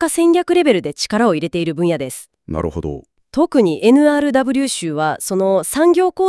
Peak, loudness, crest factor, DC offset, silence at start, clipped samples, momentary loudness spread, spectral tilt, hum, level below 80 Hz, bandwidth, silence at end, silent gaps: 0 dBFS; -16 LUFS; 16 dB; under 0.1%; 0 s; under 0.1%; 13 LU; -5 dB/octave; none; -46 dBFS; 12 kHz; 0 s; none